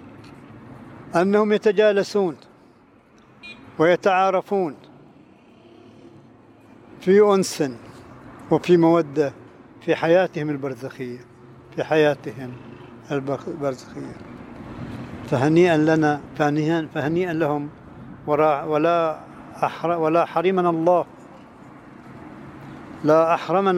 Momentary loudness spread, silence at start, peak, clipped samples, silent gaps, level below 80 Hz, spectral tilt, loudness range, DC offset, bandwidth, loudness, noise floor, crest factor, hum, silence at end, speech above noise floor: 23 LU; 0 s; -4 dBFS; under 0.1%; none; -58 dBFS; -6.5 dB/octave; 5 LU; under 0.1%; 15.5 kHz; -20 LUFS; -53 dBFS; 18 dB; none; 0 s; 33 dB